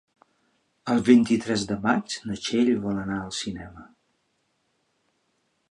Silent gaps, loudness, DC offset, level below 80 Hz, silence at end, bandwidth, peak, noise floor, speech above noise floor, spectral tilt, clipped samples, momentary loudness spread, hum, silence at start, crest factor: none; -24 LUFS; under 0.1%; -58 dBFS; 1.85 s; 10.5 kHz; -4 dBFS; -72 dBFS; 49 dB; -5 dB/octave; under 0.1%; 15 LU; none; 0.85 s; 22 dB